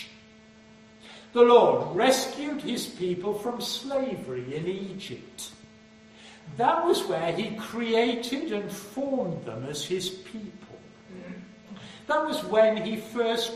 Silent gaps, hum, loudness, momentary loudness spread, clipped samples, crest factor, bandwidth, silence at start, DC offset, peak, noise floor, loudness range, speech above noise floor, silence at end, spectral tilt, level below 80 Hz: none; none; -26 LUFS; 21 LU; under 0.1%; 22 dB; 14 kHz; 0 s; under 0.1%; -6 dBFS; -53 dBFS; 9 LU; 27 dB; 0 s; -4 dB/octave; -66 dBFS